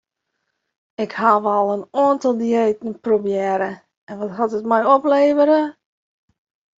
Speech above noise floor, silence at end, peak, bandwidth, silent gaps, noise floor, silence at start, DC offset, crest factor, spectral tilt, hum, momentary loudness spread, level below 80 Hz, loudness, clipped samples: 58 dB; 1.1 s; -2 dBFS; 7.8 kHz; 3.97-4.07 s; -76 dBFS; 1 s; under 0.1%; 16 dB; -6.5 dB/octave; none; 13 LU; -68 dBFS; -18 LUFS; under 0.1%